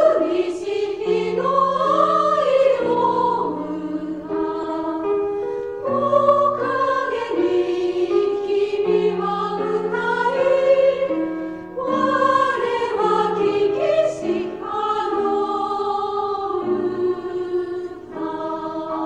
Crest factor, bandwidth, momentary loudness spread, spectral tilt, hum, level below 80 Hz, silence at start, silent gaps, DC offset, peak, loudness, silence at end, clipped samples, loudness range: 16 dB; 9.4 kHz; 10 LU; -6 dB/octave; none; -58 dBFS; 0 s; none; 0.1%; -4 dBFS; -20 LUFS; 0 s; under 0.1%; 4 LU